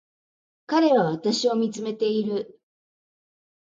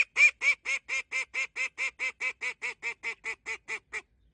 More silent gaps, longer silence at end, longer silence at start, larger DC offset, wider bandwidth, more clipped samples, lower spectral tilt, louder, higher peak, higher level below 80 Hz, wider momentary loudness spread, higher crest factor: neither; first, 1.2 s vs 0.35 s; first, 0.7 s vs 0 s; neither; about the same, 9.2 kHz vs 10 kHz; neither; first, -5 dB/octave vs 1.5 dB/octave; first, -23 LUFS vs -29 LUFS; first, -8 dBFS vs -12 dBFS; about the same, -76 dBFS vs -72 dBFS; second, 9 LU vs 15 LU; about the same, 16 dB vs 20 dB